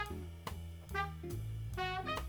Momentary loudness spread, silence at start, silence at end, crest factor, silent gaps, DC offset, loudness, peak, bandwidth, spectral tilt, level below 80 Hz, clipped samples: 8 LU; 0 s; 0 s; 18 dB; none; under 0.1%; -42 LUFS; -24 dBFS; over 20 kHz; -5 dB/octave; -50 dBFS; under 0.1%